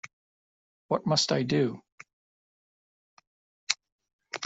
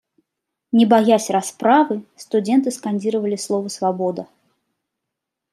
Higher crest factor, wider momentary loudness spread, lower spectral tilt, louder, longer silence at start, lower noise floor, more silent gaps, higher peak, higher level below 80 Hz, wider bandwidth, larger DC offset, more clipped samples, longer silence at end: first, 30 dB vs 18 dB; first, 21 LU vs 9 LU; about the same, -4 dB/octave vs -5 dB/octave; second, -28 LUFS vs -19 LUFS; second, 0.05 s vs 0.75 s; first, under -90 dBFS vs -82 dBFS; first, 0.13-0.89 s, 1.92-1.98 s, 2.13-3.17 s, 3.27-3.67 s, 3.92-3.99 s, 4.13-4.19 s vs none; about the same, -4 dBFS vs -2 dBFS; about the same, -70 dBFS vs -72 dBFS; second, 8.2 kHz vs 13.5 kHz; neither; neither; second, 0 s vs 1.3 s